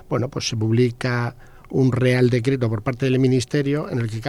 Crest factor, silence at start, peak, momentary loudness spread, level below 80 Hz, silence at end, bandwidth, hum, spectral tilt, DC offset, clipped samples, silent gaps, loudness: 16 dB; 0.1 s; -6 dBFS; 7 LU; -48 dBFS; 0 s; 12 kHz; none; -6.5 dB/octave; under 0.1%; under 0.1%; none; -21 LUFS